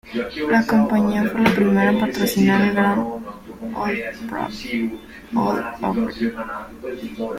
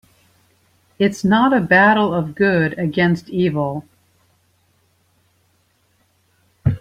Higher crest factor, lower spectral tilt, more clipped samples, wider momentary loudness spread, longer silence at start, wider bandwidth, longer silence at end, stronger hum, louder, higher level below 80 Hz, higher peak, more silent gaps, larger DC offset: about the same, 18 dB vs 18 dB; about the same, -6 dB/octave vs -7 dB/octave; neither; first, 15 LU vs 11 LU; second, 0.05 s vs 1 s; first, 16 kHz vs 13 kHz; about the same, 0 s vs 0 s; neither; second, -20 LUFS vs -17 LUFS; about the same, -48 dBFS vs -48 dBFS; about the same, -4 dBFS vs -2 dBFS; neither; neither